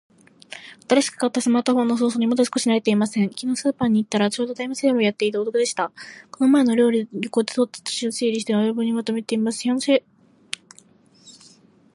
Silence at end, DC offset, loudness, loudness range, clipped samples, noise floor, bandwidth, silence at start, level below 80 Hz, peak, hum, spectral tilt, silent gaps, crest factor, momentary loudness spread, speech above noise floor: 0.65 s; under 0.1%; -21 LUFS; 3 LU; under 0.1%; -53 dBFS; 11.5 kHz; 0.5 s; -66 dBFS; -4 dBFS; none; -4.5 dB/octave; none; 18 dB; 10 LU; 33 dB